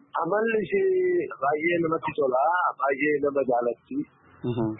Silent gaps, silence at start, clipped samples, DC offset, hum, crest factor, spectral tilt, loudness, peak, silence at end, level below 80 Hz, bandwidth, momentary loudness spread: none; 0.15 s; under 0.1%; under 0.1%; none; 12 dB; -11 dB/octave; -25 LUFS; -12 dBFS; 0 s; -64 dBFS; 3.9 kHz; 10 LU